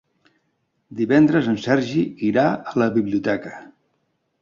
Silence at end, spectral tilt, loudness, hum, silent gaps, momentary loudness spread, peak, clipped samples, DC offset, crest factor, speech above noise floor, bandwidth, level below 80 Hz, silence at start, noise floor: 0.8 s; -7.5 dB/octave; -20 LUFS; none; none; 12 LU; -4 dBFS; under 0.1%; under 0.1%; 18 dB; 51 dB; 7.2 kHz; -60 dBFS; 0.9 s; -70 dBFS